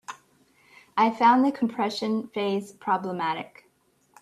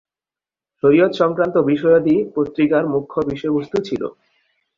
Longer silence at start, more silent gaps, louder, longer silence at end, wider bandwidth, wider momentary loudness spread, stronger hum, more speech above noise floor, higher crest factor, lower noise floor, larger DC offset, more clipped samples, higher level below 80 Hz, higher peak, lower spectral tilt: second, 0.1 s vs 0.85 s; neither; second, -25 LUFS vs -18 LUFS; about the same, 0.75 s vs 0.65 s; first, 13 kHz vs 7.2 kHz; first, 15 LU vs 9 LU; neither; second, 41 dB vs over 73 dB; about the same, 18 dB vs 16 dB; second, -66 dBFS vs under -90 dBFS; neither; neither; second, -74 dBFS vs -56 dBFS; second, -8 dBFS vs -2 dBFS; second, -5.5 dB/octave vs -8 dB/octave